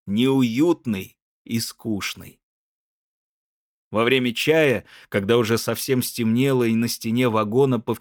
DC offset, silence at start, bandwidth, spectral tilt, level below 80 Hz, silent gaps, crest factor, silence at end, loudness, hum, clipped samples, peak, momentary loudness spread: under 0.1%; 0.05 s; over 20 kHz; -5 dB/octave; -66 dBFS; 1.22-1.45 s, 2.43-3.91 s; 18 dB; 0 s; -21 LUFS; none; under 0.1%; -4 dBFS; 9 LU